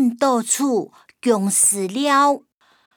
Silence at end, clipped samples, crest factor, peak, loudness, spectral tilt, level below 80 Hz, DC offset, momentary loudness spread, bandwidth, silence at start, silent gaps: 0.6 s; under 0.1%; 14 dB; -4 dBFS; -18 LUFS; -3 dB/octave; -74 dBFS; under 0.1%; 10 LU; over 20 kHz; 0 s; none